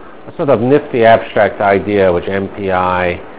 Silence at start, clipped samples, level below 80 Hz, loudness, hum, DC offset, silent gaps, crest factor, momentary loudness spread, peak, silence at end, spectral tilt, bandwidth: 0 s; 0.5%; -38 dBFS; -13 LUFS; none; 2%; none; 12 dB; 9 LU; 0 dBFS; 0 s; -10 dB/octave; 4 kHz